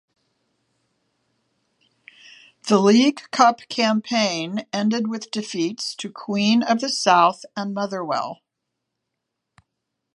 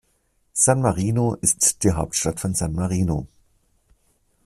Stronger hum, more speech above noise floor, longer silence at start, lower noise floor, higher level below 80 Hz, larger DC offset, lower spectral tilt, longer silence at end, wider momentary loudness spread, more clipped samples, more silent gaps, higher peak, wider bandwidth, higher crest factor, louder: neither; first, 60 dB vs 45 dB; first, 2.65 s vs 0.55 s; first, -80 dBFS vs -66 dBFS; second, -74 dBFS vs -42 dBFS; neither; about the same, -4 dB/octave vs -4.5 dB/octave; first, 1.8 s vs 1.2 s; first, 13 LU vs 8 LU; neither; neither; about the same, -2 dBFS vs 0 dBFS; second, 11.5 kHz vs 15 kHz; about the same, 22 dB vs 22 dB; about the same, -21 LUFS vs -21 LUFS